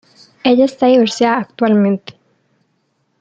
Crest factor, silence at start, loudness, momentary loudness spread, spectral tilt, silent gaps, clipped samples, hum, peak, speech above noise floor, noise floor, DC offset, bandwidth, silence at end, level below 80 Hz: 14 dB; 0.45 s; -14 LUFS; 6 LU; -6 dB/octave; none; under 0.1%; none; -2 dBFS; 51 dB; -64 dBFS; under 0.1%; 8.8 kHz; 1.1 s; -60 dBFS